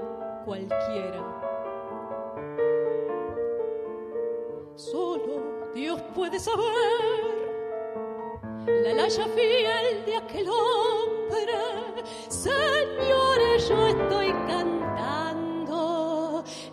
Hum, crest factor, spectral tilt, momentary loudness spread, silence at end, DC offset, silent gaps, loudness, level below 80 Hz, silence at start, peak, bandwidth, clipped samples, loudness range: none; 16 dB; -4 dB/octave; 12 LU; 0 s; under 0.1%; none; -27 LUFS; -52 dBFS; 0 s; -10 dBFS; 13 kHz; under 0.1%; 6 LU